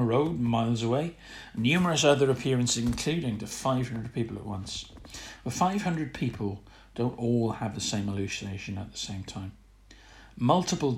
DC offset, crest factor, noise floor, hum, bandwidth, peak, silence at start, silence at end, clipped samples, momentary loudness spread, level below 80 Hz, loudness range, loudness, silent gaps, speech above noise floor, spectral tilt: under 0.1%; 20 dB; -54 dBFS; none; 15.5 kHz; -8 dBFS; 0 s; 0 s; under 0.1%; 14 LU; -52 dBFS; 6 LU; -29 LUFS; none; 25 dB; -5 dB/octave